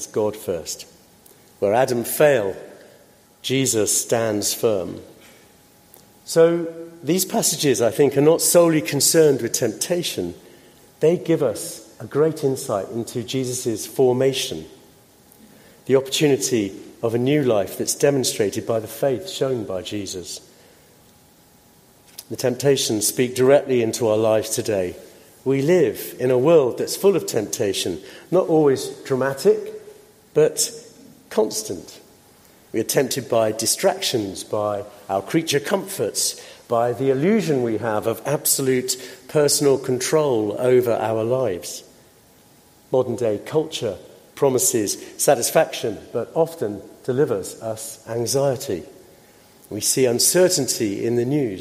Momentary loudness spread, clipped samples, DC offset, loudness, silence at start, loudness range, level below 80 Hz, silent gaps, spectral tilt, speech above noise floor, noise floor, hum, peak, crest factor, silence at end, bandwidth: 13 LU; under 0.1%; under 0.1%; -20 LUFS; 0 s; 6 LU; -62 dBFS; none; -4 dB/octave; 32 dB; -53 dBFS; none; -2 dBFS; 18 dB; 0 s; 16 kHz